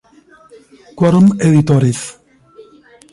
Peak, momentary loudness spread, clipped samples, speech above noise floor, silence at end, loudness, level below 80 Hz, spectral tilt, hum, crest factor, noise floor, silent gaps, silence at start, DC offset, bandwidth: -2 dBFS; 12 LU; under 0.1%; 35 dB; 0.5 s; -12 LUFS; -48 dBFS; -7.5 dB/octave; none; 14 dB; -46 dBFS; none; 0.95 s; under 0.1%; 11.5 kHz